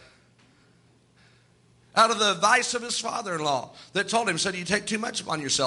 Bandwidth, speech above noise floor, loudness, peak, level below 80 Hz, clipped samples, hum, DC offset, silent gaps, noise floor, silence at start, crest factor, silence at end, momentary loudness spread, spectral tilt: 11.5 kHz; 35 dB; -25 LUFS; -6 dBFS; -66 dBFS; under 0.1%; none; under 0.1%; none; -60 dBFS; 1.95 s; 22 dB; 0 s; 9 LU; -2 dB/octave